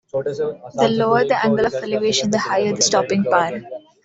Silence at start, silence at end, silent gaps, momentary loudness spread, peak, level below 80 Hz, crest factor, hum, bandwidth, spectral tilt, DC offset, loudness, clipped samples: 0.15 s; 0.25 s; none; 9 LU; -2 dBFS; -58 dBFS; 16 dB; none; 8.2 kHz; -3.5 dB/octave; under 0.1%; -18 LUFS; under 0.1%